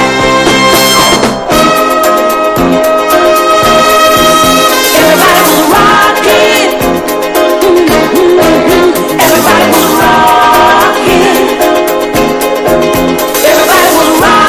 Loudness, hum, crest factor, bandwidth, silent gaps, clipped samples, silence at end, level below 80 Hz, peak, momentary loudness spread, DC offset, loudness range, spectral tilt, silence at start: -6 LUFS; none; 6 dB; 16 kHz; none; 3%; 0 s; -30 dBFS; 0 dBFS; 5 LU; under 0.1%; 2 LU; -3 dB/octave; 0 s